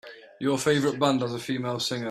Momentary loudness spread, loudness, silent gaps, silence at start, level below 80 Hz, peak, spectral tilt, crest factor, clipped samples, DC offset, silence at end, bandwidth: 7 LU; -26 LUFS; none; 0.05 s; -66 dBFS; -8 dBFS; -4.5 dB/octave; 18 dB; under 0.1%; under 0.1%; 0 s; 14 kHz